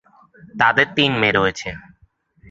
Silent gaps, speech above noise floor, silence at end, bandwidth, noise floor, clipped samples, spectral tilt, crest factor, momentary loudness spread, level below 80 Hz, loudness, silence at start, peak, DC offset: none; 39 dB; 0.7 s; 8 kHz; -58 dBFS; under 0.1%; -4.5 dB/octave; 20 dB; 20 LU; -50 dBFS; -17 LUFS; 0.45 s; 0 dBFS; under 0.1%